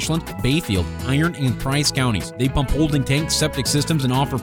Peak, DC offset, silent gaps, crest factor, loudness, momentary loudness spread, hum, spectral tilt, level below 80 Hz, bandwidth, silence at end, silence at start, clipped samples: -6 dBFS; under 0.1%; none; 14 dB; -20 LUFS; 4 LU; none; -4.5 dB/octave; -32 dBFS; 18 kHz; 0 s; 0 s; under 0.1%